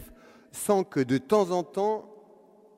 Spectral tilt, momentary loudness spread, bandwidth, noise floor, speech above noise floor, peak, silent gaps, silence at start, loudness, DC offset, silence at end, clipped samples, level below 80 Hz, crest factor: -5.5 dB/octave; 10 LU; 16 kHz; -56 dBFS; 30 dB; -10 dBFS; none; 0 s; -27 LUFS; under 0.1%; 0.65 s; under 0.1%; -64 dBFS; 18 dB